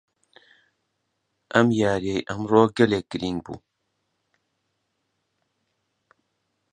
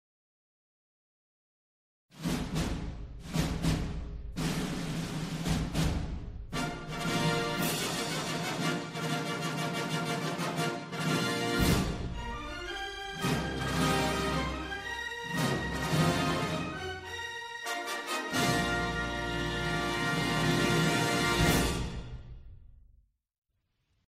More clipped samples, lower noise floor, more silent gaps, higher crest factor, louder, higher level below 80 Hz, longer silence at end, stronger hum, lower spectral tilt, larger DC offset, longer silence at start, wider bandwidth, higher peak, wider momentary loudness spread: neither; about the same, -76 dBFS vs -78 dBFS; neither; first, 26 dB vs 20 dB; first, -22 LUFS vs -32 LUFS; second, -56 dBFS vs -44 dBFS; first, 3.15 s vs 1.35 s; neither; first, -6.5 dB/octave vs -4.5 dB/octave; neither; second, 1.55 s vs 2.15 s; second, 10 kHz vs 15.5 kHz; first, -2 dBFS vs -14 dBFS; first, 13 LU vs 10 LU